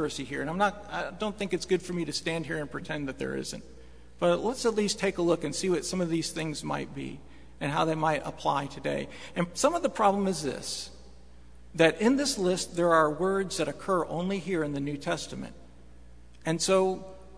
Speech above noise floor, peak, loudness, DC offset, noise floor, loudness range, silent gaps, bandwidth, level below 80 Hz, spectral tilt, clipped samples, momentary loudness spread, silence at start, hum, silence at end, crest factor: 24 dB; -6 dBFS; -29 LUFS; 0.3%; -53 dBFS; 5 LU; none; 11 kHz; -54 dBFS; -4.5 dB/octave; under 0.1%; 11 LU; 0 s; none; 0 s; 24 dB